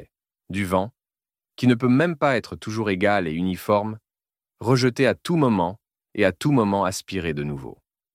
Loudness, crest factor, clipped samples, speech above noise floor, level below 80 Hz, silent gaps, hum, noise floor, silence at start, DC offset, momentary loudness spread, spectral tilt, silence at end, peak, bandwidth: -22 LUFS; 18 dB; under 0.1%; over 68 dB; -54 dBFS; none; none; under -90 dBFS; 0 s; under 0.1%; 12 LU; -6.5 dB/octave; 0.45 s; -4 dBFS; 16 kHz